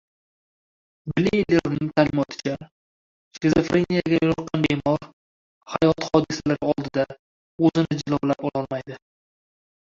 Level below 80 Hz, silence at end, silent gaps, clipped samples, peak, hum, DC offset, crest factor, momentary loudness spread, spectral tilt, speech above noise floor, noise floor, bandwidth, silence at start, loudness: -52 dBFS; 0.95 s; 2.71-3.31 s, 5.13-5.61 s, 7.19-7.58 s; under 0.1%; -2 dBFS; none; under 0.1%; 20 dB; 10 LU; -6.5 dB/octave; over 68 dB; under -90 dBFS; 7.6 kHz; 1.05 s; -23 LUFS